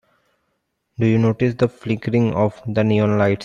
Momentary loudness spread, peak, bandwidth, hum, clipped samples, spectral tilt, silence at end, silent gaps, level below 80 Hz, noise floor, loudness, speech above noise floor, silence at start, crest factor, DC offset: 5 LU; -4 dBFS; 7.4 kHz; none; under 0.1%; -8.5 dB/octave; 0 s; none; -52 dBFS; -72 dBFS; -19 LUFS; 54 dB; 1 s; 16 dB; under 0.1%